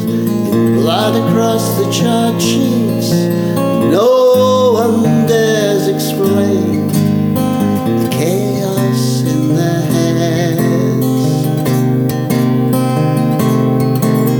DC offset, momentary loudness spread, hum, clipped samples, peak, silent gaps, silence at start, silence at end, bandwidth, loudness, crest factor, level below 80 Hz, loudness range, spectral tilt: under 0.1%; 4 LU; none; under 0.1%; 0 dBFS; none; 0 s; 0 s; over 20 kHz; -13 LUFS; 12 dB; -48 dBFS; 2 LU; -6.5 dB/octave